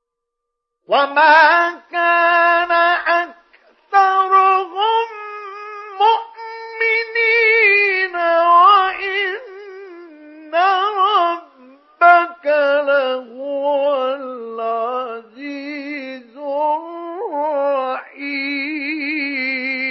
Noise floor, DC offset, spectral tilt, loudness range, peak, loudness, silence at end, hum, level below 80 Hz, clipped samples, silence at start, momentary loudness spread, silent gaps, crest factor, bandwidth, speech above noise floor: -79 dBFS; under 0.1%; -3 dB/octave; 9 LU; 0 dBFS; -15 LUFS; 0 s; none; -64 dBFS; under 0.1%; 0.9 s; 19 LU; none; 16 dB; 6.2 kHz; 66 dB